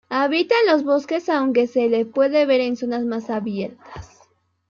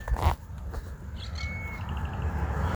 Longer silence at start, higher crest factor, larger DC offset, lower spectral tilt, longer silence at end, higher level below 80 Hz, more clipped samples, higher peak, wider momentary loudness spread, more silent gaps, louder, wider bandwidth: about the same, 0.1 s vs 0 s; second, 16 dB vs 22 dB; neither; about the same, -5.5 dB/octave vs -6.5 dB/octave; first, 0.65 s vs 0 s; second, -58 dBFS vs -34 dBFS; neither; first, -4 dBFS vs -8 dBFS; about the same, 13 LU vs 11 LU; neither; first, -20 LUFS vs -34 LUFS; second, 7.2 kHz vs over 20 kHz